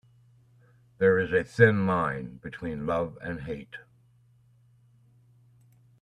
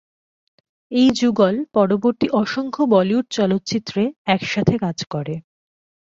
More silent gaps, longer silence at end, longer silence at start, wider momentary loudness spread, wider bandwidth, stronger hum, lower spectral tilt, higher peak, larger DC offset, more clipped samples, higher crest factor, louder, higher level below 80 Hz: second, none vs 4.16-4.25 s; first, 2.2 s vs 0.7 s; about the same, 1 s vs 0.9 s; first, 18 LU vs 9 LU; first, 10 kHz vs 7.8 kHz; neither; first, -8 dB/octave vs -6 dB/octave; about the same, -4 dBFS vs -2 dBFS; neither; neither; first, 24 dB vs 18 dB; second, -27 LUFS vs -19 LUFS; about the same, -58 dBFS vs -56 dBFS